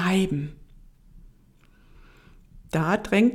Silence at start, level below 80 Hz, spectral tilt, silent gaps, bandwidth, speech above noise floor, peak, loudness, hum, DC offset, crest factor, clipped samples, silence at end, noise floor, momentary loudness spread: 0 s; -50 dBFS; -6.5 dB/octave; none; 15 kHz; 33 dB; -8 dBFS; -25 LUFS; none; under 0.1%; 18 dB; under 0.1%; 0 s; -56 dBFS; 10 LU